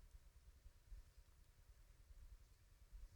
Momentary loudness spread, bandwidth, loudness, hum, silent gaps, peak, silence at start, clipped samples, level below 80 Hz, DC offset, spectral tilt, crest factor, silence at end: 4 LU; 19.5 kHz; -68 LUFS; none; none; -48 dBFS; 0 s; under 0.1%; -64 dBFS; under 0.1%; -4.5 dB/octave; 16 dB; 0 s